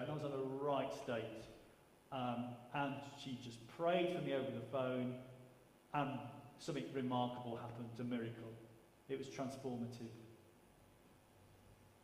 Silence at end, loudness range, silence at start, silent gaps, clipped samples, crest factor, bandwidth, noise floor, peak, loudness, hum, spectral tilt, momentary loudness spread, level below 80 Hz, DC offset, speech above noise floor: 0.1 s; 7 LU; 0 s; none; under 0.1%; 20 dB; 15.5 kHz; -67 dBFS; -24 dBFS; -44 LUFS; none; -6.5 dB/octave; 16 LU; -78 dBFS; under 0.1%; 24 dB